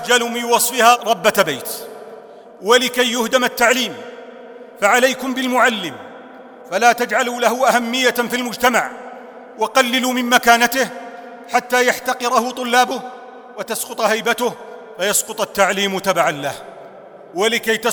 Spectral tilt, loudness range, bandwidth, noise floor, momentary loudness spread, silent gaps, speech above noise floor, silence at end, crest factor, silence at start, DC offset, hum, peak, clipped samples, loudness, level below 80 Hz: -2 dB/octave; 3 LU; over 20 kHz; -39 dBFS; 21 LU; none; 22 dB; 0 s; 18 dB; 0 s; under 0.1%; none; 0 dBFS; under 0.1%; -16 LUFS; -60 dBFS